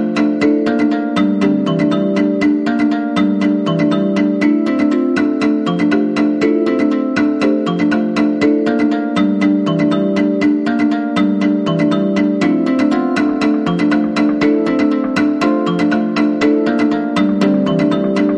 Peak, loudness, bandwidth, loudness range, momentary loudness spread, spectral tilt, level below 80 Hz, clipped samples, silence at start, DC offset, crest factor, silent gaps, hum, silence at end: 0 dBFS; -14 LUFS; 8.4 kHz; 0 LU; 2 LU; -7 dB/octave; -54 dBFS; under 0.1%; 0 s; under 0.1%; 12 dB; none; none; 0 s